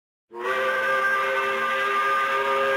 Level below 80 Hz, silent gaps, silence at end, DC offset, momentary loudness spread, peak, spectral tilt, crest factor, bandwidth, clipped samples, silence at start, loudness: -70 dBFS; none; 0 s; under 0.1%; 3 LU; -14 dBFS; -2 dB/octave; 10 dB; 16.5 kHz; under 0.1%; 0.3 s; -23 LUFS